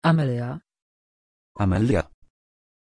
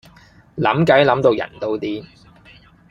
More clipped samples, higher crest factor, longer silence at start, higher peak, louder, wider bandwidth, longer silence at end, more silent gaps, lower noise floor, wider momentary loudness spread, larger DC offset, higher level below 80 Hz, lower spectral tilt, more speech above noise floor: neither; about the same, 18 dB vs 18 dB; second, 0 s vs 0.55 s; second, -8 dBFS vs 0 dBFS; second, -24 LUFS vs -17 LUFS; first, 10 kHz vs 9 kHz; about the same, 0.95 s vs 0.85 s; first, 0.82-1.55 s vs none; first, under -90 dBFS vs -48 dBFS; about the same, 15 LU vs 15 LU; neither; first, -46 dBFS vs -54 dBFS; about the same, -8 dB/octave vs -7 dB/octave; first, over 68 dB vs 31 dB